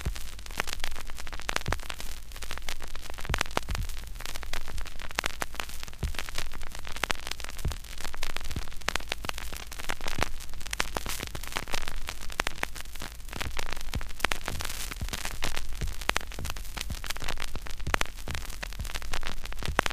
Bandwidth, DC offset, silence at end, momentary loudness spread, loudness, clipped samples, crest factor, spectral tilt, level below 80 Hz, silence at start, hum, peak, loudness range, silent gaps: 15.5 kHz; 0.2%; 0 s; 9 LU; -35 LUFS; under 0.1%; 28 dB; -2.5 dB/octave; -36 dBFS; 0 s; none; 0 dBFS; 2 LU; none